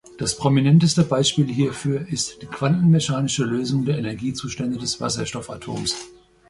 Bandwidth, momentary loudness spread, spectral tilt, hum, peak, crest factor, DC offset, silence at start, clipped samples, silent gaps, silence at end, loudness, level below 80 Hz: 11.5 kHz; 11 LU; -5 dB/octave; none; -4 dBFS; 18 dB; under 0.1%; 0.1 s; under 0.1%; none; 0.4 s; -21 LUFS; -52 dBFS